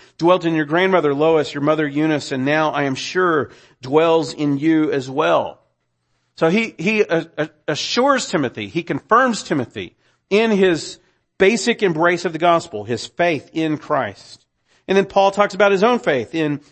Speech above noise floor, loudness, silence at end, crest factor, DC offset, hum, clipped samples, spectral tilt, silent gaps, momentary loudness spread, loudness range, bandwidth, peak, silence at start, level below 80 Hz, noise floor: 51 dB; -18 LUFS; 0.15 s; 18 dB; under 0.1%; none; under 0.1%; -5 dB/octave; none; 9 LU; 2 LU; 8.8 kHz; 0 dBFS; 0.2 s; -60 dBFS; -69 dBFS